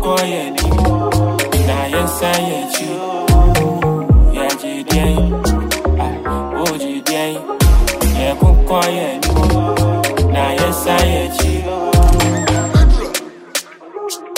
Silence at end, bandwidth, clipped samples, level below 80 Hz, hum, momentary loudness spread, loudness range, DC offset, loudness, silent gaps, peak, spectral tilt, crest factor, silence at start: 0 s; 16.5 kHz; under 0.1%; -18 dBFS; none; 8 LU; 2 LU; under 0.1%; -15 LUFS; none; 0 dBFS; -5 dB/octave; 14 dB; 0 s